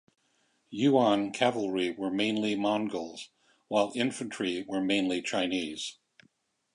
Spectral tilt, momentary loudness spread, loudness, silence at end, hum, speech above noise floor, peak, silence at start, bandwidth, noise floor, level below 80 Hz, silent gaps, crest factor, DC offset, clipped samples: -4.5 dB/octave; 12 LU; -29 LUFS; 0.8 s; none; 43 dB; -10 dBFS; 0.7 s; 11 kHz; -72 dBFS; -72 dBFS; none; 20 dB; under 0.1%; under 0.1%